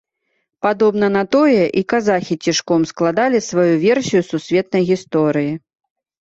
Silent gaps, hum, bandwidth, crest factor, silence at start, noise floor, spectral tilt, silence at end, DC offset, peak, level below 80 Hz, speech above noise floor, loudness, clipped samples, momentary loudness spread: none; none; 8 kHz; 14 dB; 0.65 s; -70 dBFS; -5.5 dB/octave; 0.65 s; under 0.1%; -4 dBFS; -58 dBFS; 55 dB; -16 LUFS; under 0.1%; 5 LU